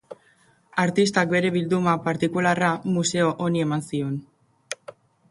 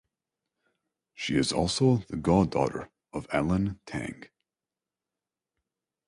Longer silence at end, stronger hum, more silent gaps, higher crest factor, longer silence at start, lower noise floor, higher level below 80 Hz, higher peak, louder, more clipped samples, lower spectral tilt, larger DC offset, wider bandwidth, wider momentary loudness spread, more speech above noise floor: second, 0.4 s vs 1.8 s; neither; neither; about the same, 20 dB vs 20 dB; second, 0.1 s vs 1.2 s; second, -60 dBFS vs under -90 dBFS; second, -64 dBFS vs -50 dBFS; first, -4 dBFS vs -10 dBFS; first, -23 LUFS vs -28 LUFS; neither; about the same, -5 dB/octave vs -5.5 dB/octave; neither; about the same, 11.5 kHz vs 11.5 kHz; about the same, 13 LU vs 15 LU; second, 37 dB vs over 63 dB